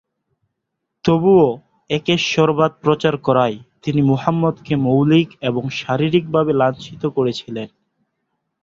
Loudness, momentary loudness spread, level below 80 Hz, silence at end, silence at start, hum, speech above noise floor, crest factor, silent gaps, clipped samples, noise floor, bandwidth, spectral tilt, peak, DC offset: -17 LUFS; 10 LU; -54 dBFS; 0.95 s; 1.05 s; none; 61 dB; 16 dB; none; under 0.1%; -77 dBFS; 7.6 kHz; -7 dB/octave; -2 dBFS; under 0.1%